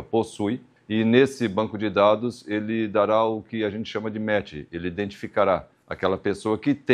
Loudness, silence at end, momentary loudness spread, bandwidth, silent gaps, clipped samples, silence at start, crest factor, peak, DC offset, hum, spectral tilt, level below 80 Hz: -24 LUFS; 0 s; 10 LU; 11.5 kHz; none; under 0.1%; 0 s; 20 dB; -4 dBFS; under 0.1%; none; -6.5 dB/octave; -58 dBFS